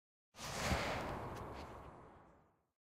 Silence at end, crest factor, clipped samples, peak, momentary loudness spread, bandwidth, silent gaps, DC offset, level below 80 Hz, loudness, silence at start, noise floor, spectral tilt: 0.4 s; 22 dB; under 0.1%; -24 dBFS; 21 LU; 16 kHz; none; under 0.1%; -56 dBFS; -43 LUFS; 0.35 s; -70 dBFS; -4 dB/octave